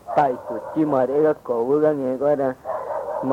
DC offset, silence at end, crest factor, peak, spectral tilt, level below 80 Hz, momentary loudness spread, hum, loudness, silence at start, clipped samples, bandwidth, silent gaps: under 0.1%; 0 s; 14 dB; -6 dBFS; -8.5 dB/octave; -62 dBFS; 9 LU; none; -22 LUFS; 0.05 s; under 0.1%; 10 kHz; none